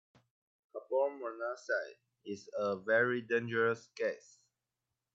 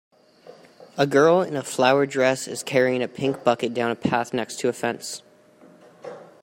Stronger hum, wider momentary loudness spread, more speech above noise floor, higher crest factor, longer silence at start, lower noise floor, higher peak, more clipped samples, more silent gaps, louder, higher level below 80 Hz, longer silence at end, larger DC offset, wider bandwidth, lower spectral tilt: neither; about the same, 19 LU vs 19 LU; first, 54 dB vs 30 dB; about the same, 18 dB vs 20 dB; first, 0.75 s vs 0.45 s; first, -89 dBFS vs -52 dBFS; second, -18 dBFS vs -4 dBFS; neither; neither; second, -35 LUFS vs -22 LUFS; second, -88 dBFS vs -66 dBFS; first, 0.95 s vs 0.2 s; neither; second, 7.8 kHz vs 16 kHz; about the same, -5.5 dB/octave vs -4.5 dB/octave